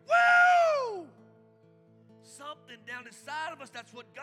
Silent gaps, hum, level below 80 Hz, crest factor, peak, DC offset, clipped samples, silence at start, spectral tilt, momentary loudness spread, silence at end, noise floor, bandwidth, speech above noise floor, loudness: none; none; under -90 dBFS; 16 dB; -12 dBFS; under 0.1%; under 0.1%; 0.1 s; -2 dB/octave; 25 LU; 0 s; -60 dBFS; 11.5 kHz; 18 dB; -25 LUFS